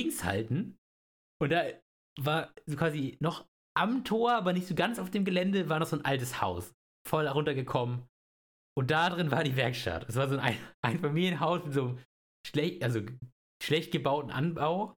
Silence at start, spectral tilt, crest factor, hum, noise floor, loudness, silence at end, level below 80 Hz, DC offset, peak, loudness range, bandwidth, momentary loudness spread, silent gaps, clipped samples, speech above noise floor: 0 s; -6 dB/octave; 22 dB; none; under -90 dBFS; -31 LUFS; 0.1 s; -62 dBFS; under 0.1%; -10 dBFS; 3 LU; 19.5 kHz; 10 LU; 0.78-1.40 s, 1.82-2.16 s, 3.48-3.75 s, 6.74-7.05 s, 8.09-8.76 s, 10.74-10.83 s, 12.05-12.44 s, 13.32-13.60 s; under 0.1%; over 59 dB